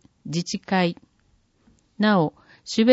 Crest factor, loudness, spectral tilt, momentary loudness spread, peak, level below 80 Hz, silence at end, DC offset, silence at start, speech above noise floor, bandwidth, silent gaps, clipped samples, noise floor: 20 dB; -24 LUFS; -5.5 dB/octave; 13 LU; -4 dBFS; -64 dBFS; 0 s; under 0.1%; 0.25 s; 43 dB; 8 kHz; none; under 0.1%; -63 dBFS